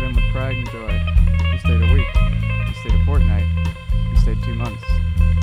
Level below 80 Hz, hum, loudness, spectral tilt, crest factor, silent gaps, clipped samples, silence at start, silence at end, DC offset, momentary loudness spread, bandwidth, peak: -18 dBFS; none; -19 LUFS; -7.5 dB/octave; 12 dB; none; under 0.1%; 0 s; 0 s; under 0.1%; 7 LU; 9 kHz; -4 dBFS